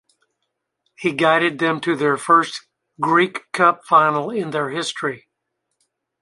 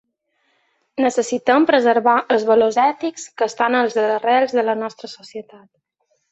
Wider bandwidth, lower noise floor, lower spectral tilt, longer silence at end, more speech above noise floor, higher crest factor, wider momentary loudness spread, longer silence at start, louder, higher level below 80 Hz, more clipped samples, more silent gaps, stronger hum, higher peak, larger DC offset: first, 11.5 kHz vs 8.2 kHz; first, -77 dBFS vs -68 dBFS; about the same, -4.5 dB/octave vs -3.5 dB/octave; first, 1.05 s vs 0.9 s; first, 58 dB vs 51 dB; about the same, 18 dB vs 16 dB; second, 11 LU vs 18 LU; about the same, 1 s vs 0.95 s; about the same, -18 LUFS vs -17 LUFS; about the same, -70 dBFS vs -66 dBFS; neither; neither; neither; about the same, -2 dBFS vs -2 dBFS; neither